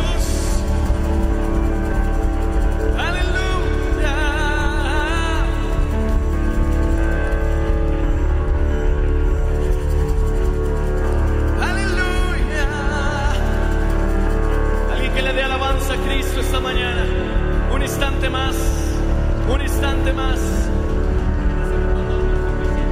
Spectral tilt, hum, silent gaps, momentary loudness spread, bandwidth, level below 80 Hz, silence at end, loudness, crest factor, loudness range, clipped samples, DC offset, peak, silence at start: -6 dB/octave; none; none; 2 LU; 14.5 kHz; -18 dBFS; 0 s; -20 LUFS; 12 dB; 0 LU; under 0.1%; under 0.1%; -4 dBFS; 0 s